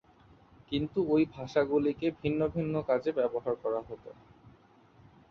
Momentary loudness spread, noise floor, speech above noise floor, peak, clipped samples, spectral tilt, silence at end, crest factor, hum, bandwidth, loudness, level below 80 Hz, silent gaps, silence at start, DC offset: 8 LU; -60 dBFS; 30 dB; -14 dBFS; under 0.1%; -8 dB/octave; 0.8 s; 18 dB; none; 6.6 kHz; -31 LUFS; -60 dBFS; none; 0.7 s; under 0.1%